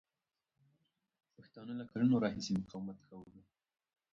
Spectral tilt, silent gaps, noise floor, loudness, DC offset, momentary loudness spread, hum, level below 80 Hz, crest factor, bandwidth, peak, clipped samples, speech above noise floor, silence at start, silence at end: -6.5 dB/octave; none; under -90 dBFS; -37 LUFS; under 0.1%; 23 LU; none; -72 dBFS; 20 dB; 7.6 kHz; -20 dBFS; under 0.1%; over 53 dB; 1.4 s; 0.75 s